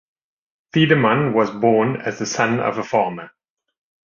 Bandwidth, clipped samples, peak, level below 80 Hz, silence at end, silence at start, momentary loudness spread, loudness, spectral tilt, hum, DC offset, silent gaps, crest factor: 7.4 kHz; under 0.1%; -2 dBFS; -58 dBFS; 0.75 s; 0.75 s; 9 LU; -18 LUFS; -5.5 dB/octave; none; under 0.1%; none; 18 dB